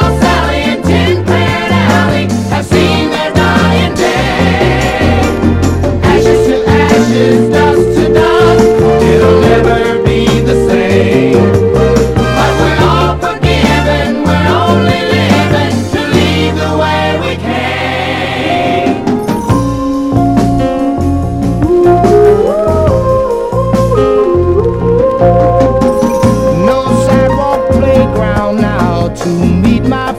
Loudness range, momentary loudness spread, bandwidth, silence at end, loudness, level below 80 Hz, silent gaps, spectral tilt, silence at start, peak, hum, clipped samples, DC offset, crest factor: 4 LU; 5 LU; 15.5 kHz; 0 s; -9 LUFS; -22 dBFS; none; -6.5 dB/octave; 0 s; 0 dBFS; none; 0.6%; under 0.1%; 8 dB